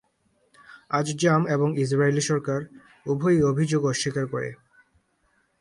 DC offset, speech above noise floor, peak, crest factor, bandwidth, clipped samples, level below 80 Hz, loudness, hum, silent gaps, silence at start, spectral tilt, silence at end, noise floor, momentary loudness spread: under 0.1%; 45 dB; -8 dBFS; 18 dB; 11.5 kHz; under 0.1%; -60 dBFS; -24 LUFS; none; none; 0.7 s; -5.5 dB/octave; 1.05 s; -68 dBFS; 10 LU